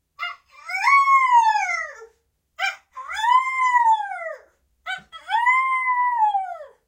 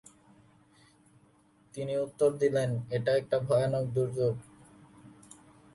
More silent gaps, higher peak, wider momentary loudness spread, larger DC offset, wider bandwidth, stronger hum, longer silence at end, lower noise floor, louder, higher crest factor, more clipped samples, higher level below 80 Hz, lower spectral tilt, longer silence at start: neither; first, -6 dBFS vs -16 dBFS; first, 18 LU vs 13 LU; neither; first, 16 kHz vs 11.5 kHz; neither; second, 0.2 s vs 0.65 s; about the same, -66 dBFS vs -64 dBFS; first, -19 LUFS vs -30 LUFS; about the same, 16 dB vs 18 dB; neither; about the same, -70 dBFS vs -66 dBFS; second, 2 dB/octave vs -7 dB/octave; second, 0.2 s vs 1.75 s